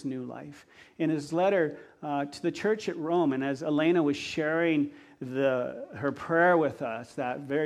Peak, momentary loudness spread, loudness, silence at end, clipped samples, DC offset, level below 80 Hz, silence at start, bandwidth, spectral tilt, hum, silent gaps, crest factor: -10 dBFS; 12 LU; -29 LUFS; 0 s; under 0.1%; under 0.1%; -70 dBFS; 0 s; 11.5 kHz; -6.5 dB/octave; none; none; 18 dB